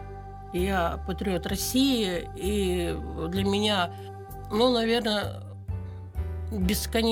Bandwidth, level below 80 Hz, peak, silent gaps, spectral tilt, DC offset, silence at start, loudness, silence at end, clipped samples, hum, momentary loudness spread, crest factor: 19 kHz; -38 dBFS; -10 dBFS; none; -5 dB/octave; under 0.1%; 0 s; -27 LUFS; 0 s; under 0.1%; none; 14 LU; 18 dB